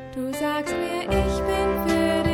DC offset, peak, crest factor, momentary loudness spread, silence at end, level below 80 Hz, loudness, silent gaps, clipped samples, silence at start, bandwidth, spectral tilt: under 0.1%; -8 dBFS; 14 dB; 5 LU; 0 s; -34 dBFS; -24 LUFS; none; under 0.1%; 0 s; 17.5 kHz; -5.5 dB/octave